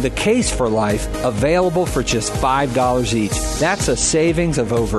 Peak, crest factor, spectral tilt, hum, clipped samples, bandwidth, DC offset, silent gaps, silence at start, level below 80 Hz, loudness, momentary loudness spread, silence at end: -4 dBFS; 14 dB; -4.5 dB/octave; none; under 0.1%; 12.5 kHz; under 0.1%; none; 0 s; -30 dBFS; -17 LUFS; 3 LU; 0 s